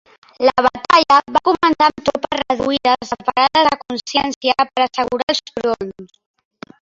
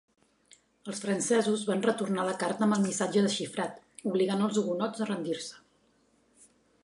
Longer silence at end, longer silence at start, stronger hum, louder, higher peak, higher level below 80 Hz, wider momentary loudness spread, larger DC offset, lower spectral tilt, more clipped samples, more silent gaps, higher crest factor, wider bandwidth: second, 0.8 s vs 1.25 s; second, 0.4 s vs 0.85 s; neither; first, -16 LUFS vs -30 LUFS; first, 0 dBFS vs -14 dBFS; first, -52 dBFS vs -78 dBFS; about the same, 8 LU vs 10 LU; neither; about the same, -3.5 dB/octave vs -4.5 dB/octave; neither; first, 4.36-4.41 s, 5.23-5.27 s vs none; about the same, 16 dB vs 18 dB; second, 7.8 kHz vs 11.5 kHz